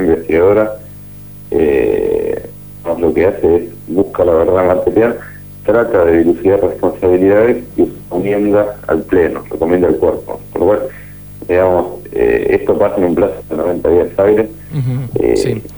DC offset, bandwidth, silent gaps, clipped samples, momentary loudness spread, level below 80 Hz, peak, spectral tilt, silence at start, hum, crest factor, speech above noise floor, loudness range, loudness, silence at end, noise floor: 0.4%; over 20 kHz; none; under 0.1%; 12 LU; -36 dBFS; 0 dBFS; -8 dB/octave; 0 s; 50 Hz at -35 dBFS; 12 dB; 20 dB; 3 LU; -13 LUFS; 0 s; -32 dBFS